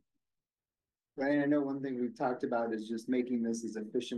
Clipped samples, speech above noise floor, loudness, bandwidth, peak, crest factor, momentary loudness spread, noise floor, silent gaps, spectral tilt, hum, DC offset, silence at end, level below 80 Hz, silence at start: under 0.1%; over 57 dB; -34 LUFS; 11.5 kHz; -20 dBFS; 16 dB; 7 LU; under -90 dBFS; none; -5.5 dB/octave; none; under 0.1%; 0 s; -86 dBFS; 1.15 s